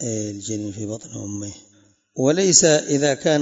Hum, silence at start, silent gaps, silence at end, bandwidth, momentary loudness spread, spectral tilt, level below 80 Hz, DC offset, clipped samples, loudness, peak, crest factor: none; 0 s; none; 0 s; 8 kHz; 18 LU; -3.5 dB/octave; -60 dBFS; under 0.1%; under 0.1%; -18 LUFS; 0 dBFS; 20 dB